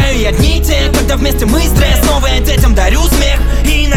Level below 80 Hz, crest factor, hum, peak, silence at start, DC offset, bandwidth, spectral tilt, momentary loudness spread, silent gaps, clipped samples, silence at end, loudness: -10 dBFS; 8 dB; none; 0 dBFS; 0 s; 0.9%; 16.5 kHz; -4.5 dB/octave; 2 LU; none; under 0.1%; 0 s; -11 LUFS